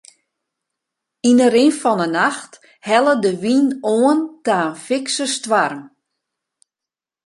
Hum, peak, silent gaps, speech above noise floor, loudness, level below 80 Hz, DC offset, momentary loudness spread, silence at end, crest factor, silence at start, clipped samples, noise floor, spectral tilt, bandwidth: none; -2 dBFS; none; 71 dB; -17 LUFS; -68 dBFS; under 0.1%; 8 LU; 1.4 s; 18 dB; 1.25 s; under 0.1%; -88 dBFS; -4 dB/octave; 11.5 kHz